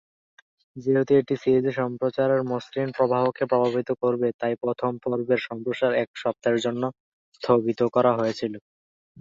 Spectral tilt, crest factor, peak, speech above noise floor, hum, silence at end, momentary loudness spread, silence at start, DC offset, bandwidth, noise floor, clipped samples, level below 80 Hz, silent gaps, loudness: -7 dB/octave; 18 dB; -6 dBFS; over 66 dB; none; 0.6 s; 8 LU; 0.75 s; under 0.1%; 7.8 kHz; under -90 dBFS; under 0.1%; -66 dBFS; 4.34-4.39 s, 6.07-6.14 s, 7.00-7.32 s; -24 LUFS